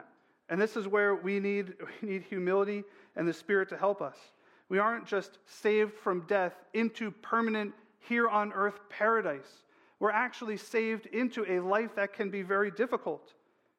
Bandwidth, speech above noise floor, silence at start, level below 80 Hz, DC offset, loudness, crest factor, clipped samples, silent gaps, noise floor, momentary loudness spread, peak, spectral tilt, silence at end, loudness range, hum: 12.5 kHz; 26 dB; 0.5 s; -86 dBFS; under 0.1%; -32 LUFS; 18 dB; under 0.1%; none; -57 dBFS; 9 LU; -14 dBFS; -6 dB/octave; 0.6 s; 2 LU; none